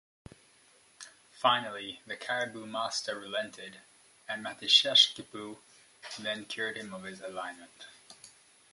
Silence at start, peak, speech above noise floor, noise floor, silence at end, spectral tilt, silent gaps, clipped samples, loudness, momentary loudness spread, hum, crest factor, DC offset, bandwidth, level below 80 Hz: 1 s; -8 dBFS; 30 dB; -63 dBFS; 0.45 s; -1 dB/octave; none; under 0.1%; -29 LUFS; 27 LU; none; 28 dB; under 0.1%; 11.5 kHz; -76 dBFS